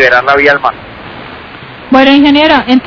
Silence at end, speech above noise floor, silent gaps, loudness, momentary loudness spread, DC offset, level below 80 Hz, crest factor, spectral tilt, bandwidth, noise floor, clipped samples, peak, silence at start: 0 s; 21 dB; none; -6 LUFS; 22 LU; under 0.1%; -38 dBFS; 8 dB; -5.5 dB/octave; 5.4 kHz; -28 dBFS; 5%; 0 dBFS; 0 s